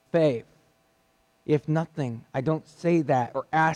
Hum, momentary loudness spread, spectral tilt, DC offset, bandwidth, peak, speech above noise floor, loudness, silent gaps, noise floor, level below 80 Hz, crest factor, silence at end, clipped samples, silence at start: none; 9 LU; -7.5 dB/octave; under 0.1%; 10 kHz; -12 dBFS; 41 dB; -27 LUFS; none; -66 dBFS; -66 dBFS; 14 dB; 0 s; under 0.1%; 0.15 s